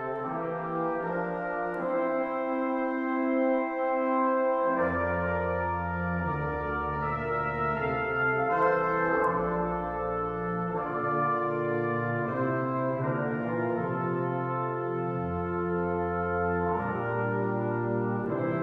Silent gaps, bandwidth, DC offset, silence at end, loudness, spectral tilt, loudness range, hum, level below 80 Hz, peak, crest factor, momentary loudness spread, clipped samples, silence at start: none; 5.6 kHz; under 0.1%; 0 s; -29 LUFS; -10 dB/octave; 2 LU; none; -52 dBFS; -14 dBFS; 16 dB; 5 LU; under 0.1%; 0 s